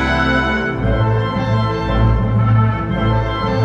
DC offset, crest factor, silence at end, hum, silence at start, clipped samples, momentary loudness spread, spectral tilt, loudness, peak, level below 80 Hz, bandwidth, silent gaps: under 0.1%; 12 dB; 0 s; none; 0 s; under 0.1%; 3 LU; -8 dB/octave; -16 LUFS; -2 dBFS; -24 dBFS; 7 kHz; none